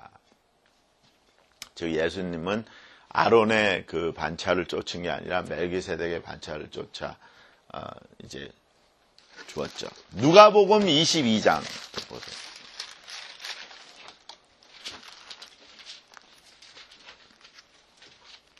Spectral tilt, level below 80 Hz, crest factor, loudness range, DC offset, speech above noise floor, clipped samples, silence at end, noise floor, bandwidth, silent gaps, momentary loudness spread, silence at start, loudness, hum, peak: -4 dB/octave; -60 dBFS; 28 dB; 22 LU; under 0.1%; 41 dB; under 0.1%; 1.5 s; -66 dBFS; 13 kHz; none; 25 LU; 1.75 s; -23 LUFS; none; 0 dBFS